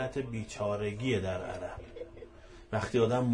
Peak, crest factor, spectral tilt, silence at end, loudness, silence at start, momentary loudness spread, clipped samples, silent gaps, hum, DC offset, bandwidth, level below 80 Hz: -16 dBFS; 16 dB; -6.5 dB/octave; 0 s; -33 LUFS; 0 s; 19 LU; under 0.1%; none; none; under 0.1%; 10.5 kHz; -54 dBFS